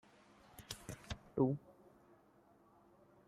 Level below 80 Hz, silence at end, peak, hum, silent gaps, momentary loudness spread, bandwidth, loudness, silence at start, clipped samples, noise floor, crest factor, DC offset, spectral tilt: -66 dBFS; 1.7 s; -22 dBFS; none; none; 26 LU; 15.5 kHz; -42 LUFS; 0.6 s; under 0.1%; -69 dBFS; 24 dB; under 0.1%; -6.5 dB/octave